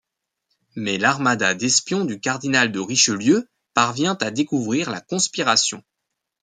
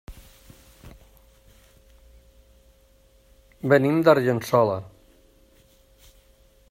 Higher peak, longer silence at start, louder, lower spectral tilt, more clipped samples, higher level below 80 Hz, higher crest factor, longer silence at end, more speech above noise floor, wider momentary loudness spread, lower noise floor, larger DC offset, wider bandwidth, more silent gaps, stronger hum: about the same, -2 dBFS vs -4 dBFS; first, 0.75 s vs 0.1 s; about the same, -20 LUFS vs -21 LUFS; second, -2.5 dB/octave vs -7 dB/octave; neither; second, -66 dBFS vs -54 dBFS; about the same, 20 dB vs 22 dB; second, 0.65 s vs 1.9 s; first, 60 dB vs 38 dB; second, 7 LU vs 12 LU; first, -80 dBFS vs -57 dBFS; neither; second, 10 kHz vs 16 kHz; neither; neither